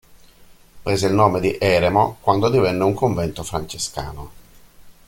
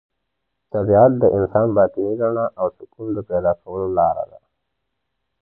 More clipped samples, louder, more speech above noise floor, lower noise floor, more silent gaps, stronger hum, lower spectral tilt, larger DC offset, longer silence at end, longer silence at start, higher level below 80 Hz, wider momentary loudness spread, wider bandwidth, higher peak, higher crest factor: neither; about the same, -19 LUFS vs -19 LUFS; second, 29 dB vs 59 dB; second, -48 dBFS vs -77 dBFS; neither; neither; second, -5.5 dB/octave vs -13.5 dB/octave; neither; second, 0.15 s vs 1.15 s; about the same, 0.75 s vs 0.75 s; about the same, -44 dBFS vs -48 dBFS; about the same, 13 LU vs 14 LU; first, 17 kHz vs 2.1 kHz; about the same, -2 dBFS vs -2 dBFS; about the same, 18 dB vs 18 dB